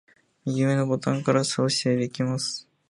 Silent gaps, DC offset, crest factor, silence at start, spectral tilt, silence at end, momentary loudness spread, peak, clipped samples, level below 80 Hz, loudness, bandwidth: none; under 0.1%; 18 dB; 0.45 s; -5 dB/octave; 0.3 s; 7 LU; -6 dBFS; under 0.1%; -68 dBFS; -25 LUFS; 11.5 kHz